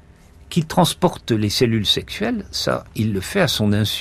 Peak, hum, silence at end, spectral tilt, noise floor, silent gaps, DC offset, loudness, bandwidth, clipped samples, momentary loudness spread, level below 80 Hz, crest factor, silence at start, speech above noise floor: -4 dBFS; none; 0 s; -5 dB/octave; -46 dBFS; none; under 0.1%; -20 LUFS; 15.5 kHz; under 0.1%; 6 LU; -44 dBFS; 16 dB; 0.4 s; 27 dB